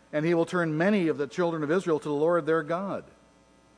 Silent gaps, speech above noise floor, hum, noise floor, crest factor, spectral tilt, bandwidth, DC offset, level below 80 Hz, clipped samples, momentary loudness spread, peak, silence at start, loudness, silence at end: none; 33 dB; none; -59 dBFS; 16 dB; -7 dB/octave; 10.5 kHz; under 0.1%; -70 dBFS; under 0.1%; 7 LU; -12 dBFS; 0.15 s; -27 LUFS; 0.75 s